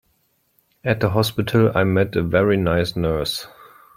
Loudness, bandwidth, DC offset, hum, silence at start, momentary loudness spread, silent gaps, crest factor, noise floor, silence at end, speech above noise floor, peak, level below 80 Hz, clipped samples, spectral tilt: -20 LUFS; 16.5 kHz; under 0.1%; none; 0.85 s; 8 LU; none; 18 dB; -65 dBFS; 0.5 s; 47 dB; -2 dBFS; -44 dBFS; under 0.1%; -6.5 dB/octave